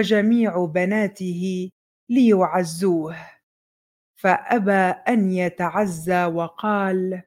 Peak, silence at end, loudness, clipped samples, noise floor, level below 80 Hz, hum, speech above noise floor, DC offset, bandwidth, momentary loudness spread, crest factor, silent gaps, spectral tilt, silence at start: -2 dBFS; 0.05 s; -21 LUFS; under 0.1%; under -90 dBFS; -66 dBFS; none; over 70 dB; under 0.1%; 16 kHz; 8 LU; 18 dB; 1.72-2.07 s, 3.43-4.14 s; -6.5 dB/octave; 0 s